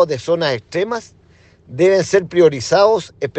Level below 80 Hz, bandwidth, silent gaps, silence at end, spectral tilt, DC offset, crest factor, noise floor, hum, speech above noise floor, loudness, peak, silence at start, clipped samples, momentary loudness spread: -56 dBFS; 8.6 kHz; none; 0 s; -5 dB/octave; under 0.1%; 16 dB; -49 dBFS; none; 33 dB; -16 LUFS; 0 dBFS; 0 s; under 0.1%; 9 LU